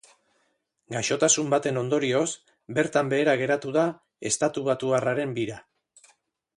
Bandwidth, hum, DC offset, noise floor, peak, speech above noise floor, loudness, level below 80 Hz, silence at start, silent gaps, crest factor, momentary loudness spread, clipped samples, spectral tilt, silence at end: 11.5 kHz; none; under 0.1%; -73 dBFS; -6 dBFS; 48 dB; -25 LUFS; -66 dBFS; 0.9 s; none; 20 dB; 10 LU; under 0.1%; -3.5 dB/octave; 0.95 s